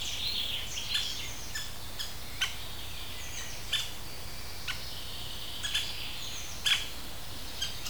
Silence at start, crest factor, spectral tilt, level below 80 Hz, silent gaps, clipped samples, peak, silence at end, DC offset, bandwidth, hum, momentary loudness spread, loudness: 0 s; 22 dB; -1 dB/octave; -48 dBFS; none; under 0.1%; -14 dBFS; 0 s; 1%; over 20 kHz; none; 10 LU; -34 LUFS